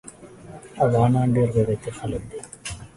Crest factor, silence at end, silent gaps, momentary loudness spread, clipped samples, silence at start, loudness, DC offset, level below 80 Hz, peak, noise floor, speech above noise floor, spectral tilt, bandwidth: 18 dB; 0.1 s; none; 23 LU; under 0.1%; 0.05 s; -22 LUFS; under 0.1%; -46 dBFS; -6 dBFS; -43 dBFS; 22 dB; -7.5 dB/octave; 11.5 kHz